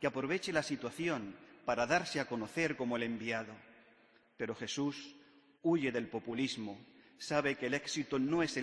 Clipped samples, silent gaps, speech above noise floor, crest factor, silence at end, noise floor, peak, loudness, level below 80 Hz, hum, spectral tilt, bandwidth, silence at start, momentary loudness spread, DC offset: under 0.1%; none; 30 dB; 20 dB; 0 s; -67 dBFS; -16 dBFS; -36 LUFS; -72 dBFS; none; -4.5 dB/octave; 11 kHz; 0 s; 13 LU; under 0.1%